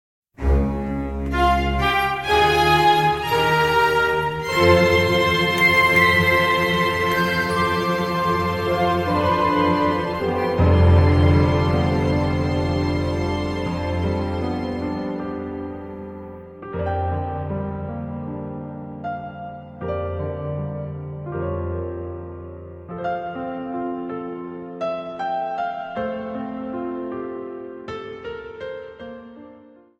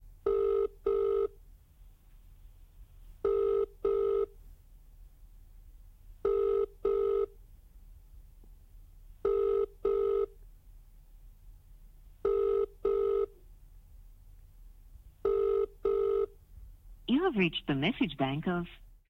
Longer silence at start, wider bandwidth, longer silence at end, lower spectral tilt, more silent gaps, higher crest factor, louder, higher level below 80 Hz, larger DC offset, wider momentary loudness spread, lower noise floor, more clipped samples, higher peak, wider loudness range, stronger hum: first, 0.4 s vs 0.05 s; first, 16.5 kHz vs 4.1 kHz; first, 0.4 s vs 0.25 s; second, -6 dB/octave vs -8 dB/octave; neither; about the same, 20 dB vs 18 dB; first, -20 LUFS vs -31 LUFS; first, -34 dBFS vs -52 dBFS; neither; first, 18 LU vs 7 LU; second, -47 dBFS vs -57 dBFS; neither; first, -2 dBFS vs -16 dBFS; first, 13 LU vs 3 LU; neither